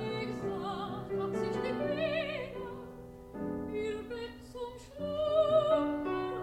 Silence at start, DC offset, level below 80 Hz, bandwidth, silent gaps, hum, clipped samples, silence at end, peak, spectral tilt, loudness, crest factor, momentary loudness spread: 0 s; under 0.1%; -58 dBFS; 13.5 kHz; none; none; under 0.1%; 0 s; -16 dBFS; -6.5 dB/octave; -34 LUFS; 18 dB; 16 LU